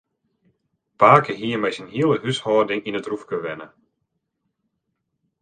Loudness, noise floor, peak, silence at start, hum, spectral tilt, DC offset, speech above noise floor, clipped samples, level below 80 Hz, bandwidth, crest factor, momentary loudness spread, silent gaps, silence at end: -20 LUFS; -76 dBFS; 0 dBFS; 1 s; none; -6 dB/octave; under 0.1%; 56 dB; under 0.1%; -64 dBFS; 9.4 kHz; 22 dB; 14 LU; none; 1.75 s